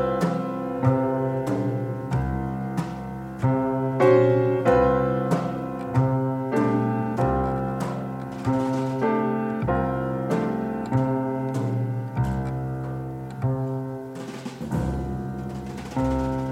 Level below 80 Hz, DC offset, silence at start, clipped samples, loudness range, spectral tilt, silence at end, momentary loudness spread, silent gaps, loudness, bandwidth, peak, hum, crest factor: -42 dBFS; under 0.1%; 0 s; under 0.1%; 7 LU; -8.5 dB/octave; 0 s; 11 LU; none; -25 LUFS; 12.5 kHz; -6 dBFS; none; 18 dB